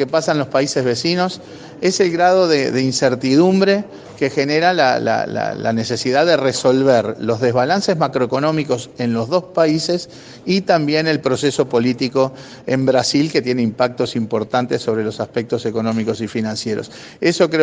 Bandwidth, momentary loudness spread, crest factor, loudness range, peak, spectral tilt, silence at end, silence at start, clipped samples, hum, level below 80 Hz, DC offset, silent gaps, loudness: 10 kHz; 8 LU; 16 dB; 3 LU; 0 dBFS; -5 dB/octave; 0 s; 0 s; under 0.1%; none; -58 dBFS; under 0.1%; none; -17 LUFS